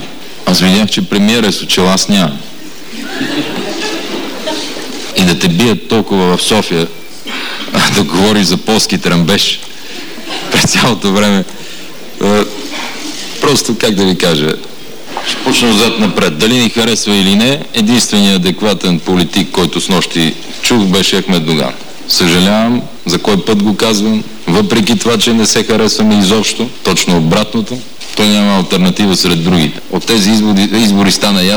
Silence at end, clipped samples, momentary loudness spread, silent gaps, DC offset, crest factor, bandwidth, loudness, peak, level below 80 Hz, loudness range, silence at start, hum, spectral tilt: 0 s; under 0.1%; 12 LU; none; 6%; 8 dB; over 20 kHz; -11 LUFS; -2 dBFS; -40 dBFS; 3 LU; 0 s; none; -4 dB/octave